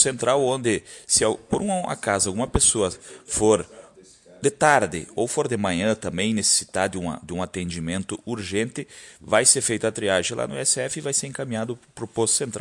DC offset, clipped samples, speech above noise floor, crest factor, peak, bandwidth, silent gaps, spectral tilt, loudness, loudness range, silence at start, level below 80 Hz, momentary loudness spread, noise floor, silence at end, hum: under 0.1%; under 0.1%; 27 dB; 22 dB; -2 dBFS; 11.5 kHz; none; -3 dB/octave; -22 LUFS; 2 LU; 0 s; -46 dBFS; 12 LU; -50 dBFS; 0 s; none